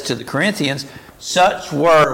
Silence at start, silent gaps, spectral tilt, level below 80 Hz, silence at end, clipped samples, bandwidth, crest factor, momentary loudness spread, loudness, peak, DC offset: 0 s; none; -4 dB/octave; -50 dBFS; 0 s; under 0.1%; 17 kHz; 12 dB; 15 LU; -17 LUFS; -4 dBFS; under 0.1%